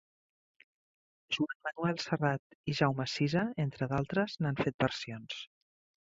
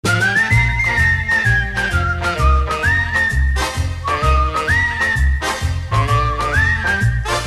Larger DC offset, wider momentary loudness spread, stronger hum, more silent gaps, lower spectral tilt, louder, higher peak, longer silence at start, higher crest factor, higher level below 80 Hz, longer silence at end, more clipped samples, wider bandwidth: second, under 0.1% vs 0.1%; first, 9 LU vs 5 LU; neither; first, 1.55-1.60 s, 2.39-2.64 s, 4.74-4.79 s vs none; first, -6 dB/octave vs -4.5 dB/octave; second, -34 LUFS vs -16 LUFS; second, -12 dBFS vs -2 dBFS; first, 1.3 s vs 0.05 s; first, 22 dB vs 14 dB; second, -66 dBFS vs -22 dBFS; first, 0.65 s vs 0 s; neither; second, 7.8 kHz vs 13.5 kHz